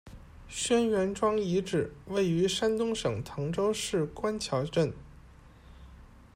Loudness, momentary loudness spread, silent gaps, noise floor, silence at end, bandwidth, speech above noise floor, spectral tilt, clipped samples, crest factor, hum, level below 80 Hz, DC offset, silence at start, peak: -30 LUFS; 7 LU; none; -53 dBFS; 0.3 s; 16 kHz; 24 dB; -5 dB/octave; under 0.1%; 16 dB; none; -54 dBFS; under 0.1%; 0.05 s; -14 dBFS